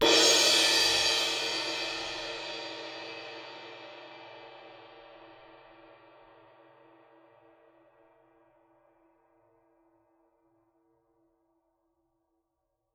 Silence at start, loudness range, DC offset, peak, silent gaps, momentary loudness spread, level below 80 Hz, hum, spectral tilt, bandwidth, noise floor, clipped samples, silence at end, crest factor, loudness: 0 s; 28 LU; under 0.1%; -10 dBFS; none; 28 LU; -68 dBFS; none; 0 dB/octave; 19.5 kHz; -82 dBFS; under 0.1%; 7.6 s; 24 dB; -25 LUFS